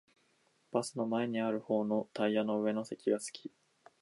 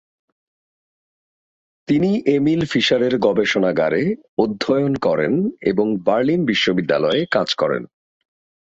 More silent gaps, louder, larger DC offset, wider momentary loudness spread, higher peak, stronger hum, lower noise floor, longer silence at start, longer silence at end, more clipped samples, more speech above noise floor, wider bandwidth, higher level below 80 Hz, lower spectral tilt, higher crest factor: second, none vs 4.29-4.37 s; second, -35 LUFS vs -18 LUFS; neither; about the same, 5 LU vs 4 LU; second, -18 dBFS vs -2 dBFS; neither; second, -73 dBFS vs under -90 dBFS; second, 0.75 s vs 1.9 s; second, 0.55 s vs 0.9 s; neither; second, 39 dB vs over 72 dB; first, 11.5 kHz vs 7.8 kHz; second, -84 dBFS vs -56 dBFS; about the same, -5.5 dB/octave vs -6 dB/octave; about the same, 18 dB vs 16 dB